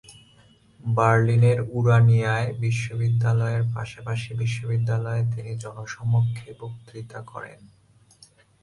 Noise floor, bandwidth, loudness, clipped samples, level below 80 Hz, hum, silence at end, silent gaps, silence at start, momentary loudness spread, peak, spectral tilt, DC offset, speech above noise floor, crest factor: -56 dBFS; 11 kHz; -23 LUFS; under 0.1%; -54 dBFS; none; 0.95 s; none; 0.1 s; 20 LU; -6 dBFS; -7 dB/octave; under 0.1%; 33 dB; 18 dB